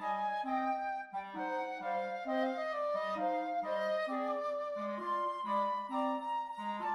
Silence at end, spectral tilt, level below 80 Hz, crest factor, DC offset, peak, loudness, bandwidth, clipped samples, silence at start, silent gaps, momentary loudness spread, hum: 0 s; -5.5 dB/octave; -78 dBFS; 14 dB; under 0.1%; -22 dBFS; -36 LUFS; 11.5 kHz; under 0.1%; 0 s; none; 4 LU; none